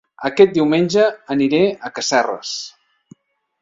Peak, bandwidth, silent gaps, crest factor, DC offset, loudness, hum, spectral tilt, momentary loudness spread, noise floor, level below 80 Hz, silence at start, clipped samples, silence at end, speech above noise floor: 0 dBFS; 7.8 kHz; none; 18 dB; under 0.1%; -17 LUFS; none; -4.5 dB/octave; 12 LU; -49 dBFS; -60 dBFS; 0.2 s; under 0.1%; 0.9 s; 33 dB